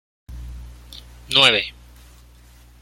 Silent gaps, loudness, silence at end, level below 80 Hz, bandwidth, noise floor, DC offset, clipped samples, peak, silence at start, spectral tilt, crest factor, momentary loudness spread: none; -15 LUFS; 1.1 s; -42 dBFS; 16.5 kHz; -48 dBFS; under 0.1%; under 0.1%; 0 dBFS; 0.3 s; -2 dB/octave; 24 dB; 27 LU